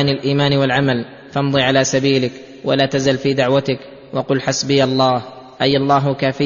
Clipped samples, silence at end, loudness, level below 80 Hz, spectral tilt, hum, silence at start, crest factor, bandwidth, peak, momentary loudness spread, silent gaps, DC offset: under 0.1%; 0 s; -17 LUFS; -52 dBFS; -5 dB/octave; none; 0 s; 16 dB; 7.4 kHz; -2 dBFS; 10 LU; none; under 0.1%